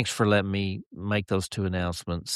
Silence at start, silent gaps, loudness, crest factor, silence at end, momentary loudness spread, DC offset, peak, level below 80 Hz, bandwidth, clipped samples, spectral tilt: 0 s; 0.86-0.91 s; -28 LUFS; 18 dB; 0 s; 10 LU; under 0.1%; -8 dBFS; -50 dBFS; 13 kHz; under 0.1%; -5 dB/octave